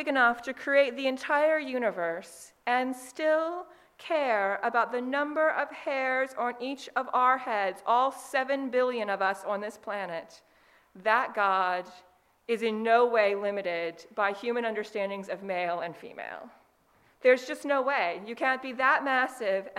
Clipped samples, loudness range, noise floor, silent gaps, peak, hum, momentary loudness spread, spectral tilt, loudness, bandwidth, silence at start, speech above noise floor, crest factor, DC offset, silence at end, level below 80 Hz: under 0.1%; 3 LU; -65 dBFS; none; -10 dBFS; none; 11 LU; -4 dB/octave; -28 LUFS; 14.5 kHz; 0 s; 37 dB; 20 dB; under 0.1%; 0 s; -78 dBFS